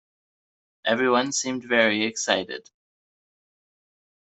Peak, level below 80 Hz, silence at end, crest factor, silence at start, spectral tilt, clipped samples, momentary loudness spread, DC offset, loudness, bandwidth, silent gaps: -6 dBFS; -70 dBFS; 1.6 s; 22 dB; 0.85 s; -2.5 dB/octave; under 0.1%; 10 LU; under 0.1%; -23 LUFS; 8.2 kHz; none